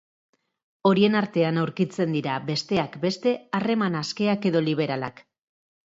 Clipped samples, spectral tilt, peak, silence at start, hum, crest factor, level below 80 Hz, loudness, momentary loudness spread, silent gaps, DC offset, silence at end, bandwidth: under 0.1%; -6.5 dB/octave; -8 dBFS; 0.85 s; none; 18 dB; -66 dBFS; -24 LUFS; 7 LU; none; under 0.1%; 0.75 s; 7.8 kHz